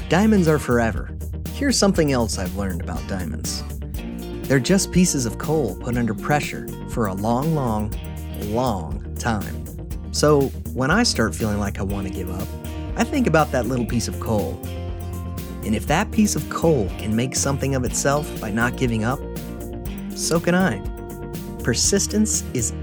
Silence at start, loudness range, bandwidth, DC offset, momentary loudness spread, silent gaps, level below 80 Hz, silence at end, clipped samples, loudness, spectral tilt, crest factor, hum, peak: 0 s; 2 LU; over 20 kHz; under 0.1%; 13 LU; none; -34 dBFS; 0 s; under 0.1%; -22 LUFS; -4.5 dB/octave; 20 dB; none; -2 dBFS